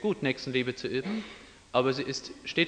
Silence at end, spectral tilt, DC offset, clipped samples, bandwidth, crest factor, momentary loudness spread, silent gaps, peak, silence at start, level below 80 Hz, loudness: 0 s; -5 dB/octave; under 0.1%; under 0.1%; 10 kHz; 20 dB; 9 LU; none; -10 dBFS; 0 s; -62 dBFS; -31 LUFS